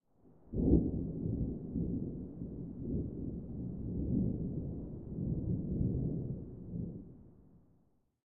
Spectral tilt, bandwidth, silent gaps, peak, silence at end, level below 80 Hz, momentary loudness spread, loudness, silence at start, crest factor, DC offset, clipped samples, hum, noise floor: -16.5 dB/octave; 1.5 kHz; none; -14 dBFS; 0 s; -46 dBFS; 12 LU; -38 LUFS; 0 s; 24 dB; under 0.1%; under 0.1%; none; -72 dBFS